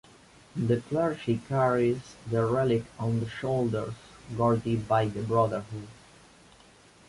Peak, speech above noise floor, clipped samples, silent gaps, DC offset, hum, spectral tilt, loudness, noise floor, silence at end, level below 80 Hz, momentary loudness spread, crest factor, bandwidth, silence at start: -10 dBFS; 29 dB; under 0.1%; none; under 0.1%; none; -7.5 dB/octave; -28 LUFS; -56 dBFS; 1.15 s; -56 dBFS; 14 LU; 18 dB; 11.5 kHz; 0.55 s